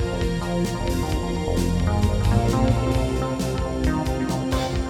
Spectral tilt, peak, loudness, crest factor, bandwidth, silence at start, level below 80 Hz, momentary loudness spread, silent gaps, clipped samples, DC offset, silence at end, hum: -6.5 dB/octave; -6 dBFS; -23 LUFS; 16 dB; 16.5 kHz; 0 s; -28 dBFS; 5 LU; none; under 0.1%; under 0.1%; 0 s; none